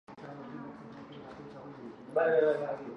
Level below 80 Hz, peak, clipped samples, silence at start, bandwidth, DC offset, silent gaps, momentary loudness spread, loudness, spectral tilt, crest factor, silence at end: -74 dBFS; -16 dBFS; under 0.1%; 0.1 s; 6.2 kHz; under 0.1%; none; 21 LU; -29 LUFS; -7.5 dB/octave; 20 dB; 0 s